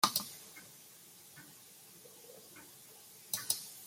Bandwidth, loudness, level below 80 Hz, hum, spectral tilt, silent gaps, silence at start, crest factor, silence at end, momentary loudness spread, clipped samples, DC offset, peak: 16.5 kHz; -38 LUFS; -80 dBFS; none; -0.5 dB/octave; none; 0 s; 34 dB; 0 s; 19 LU; under 0.1%; under 0.1%; -10 dBFS